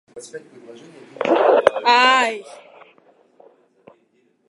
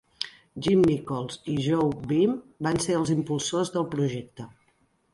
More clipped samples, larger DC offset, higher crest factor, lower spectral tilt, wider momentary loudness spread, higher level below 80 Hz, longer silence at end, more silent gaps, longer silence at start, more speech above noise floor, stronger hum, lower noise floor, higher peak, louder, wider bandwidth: neither; neither; about the same, 20 dB vs 18 dB; second, -2.5 dB/octave vs -6 dB/octave; first, 24 LU vs 13 LU; second, -66 dBFS vs -56 dBFS; first, 2.05 s vs 0.65 s; neither; about the same, 0.15 s vs 0.2 s; about the same, 44 dB vs 42 dB; neither; second, -62 dBFS vs -67 dBFS; first, 0 dBFS vs -8 dBFS; first, -16 LUFS vs -26 LUFS; about the same, 11.5 kHz vs 11.5 kHz